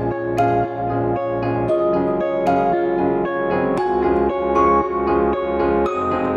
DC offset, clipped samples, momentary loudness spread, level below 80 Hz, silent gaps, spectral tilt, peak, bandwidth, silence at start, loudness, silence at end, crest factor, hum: under 0.1%; under 0.1%; 4 LU; -40 dBFS; none; -8.5 dB/octave; -6 dBFS; 7.6 kHz; 0 s; -19 LUFS; 0 s; 14 dB; none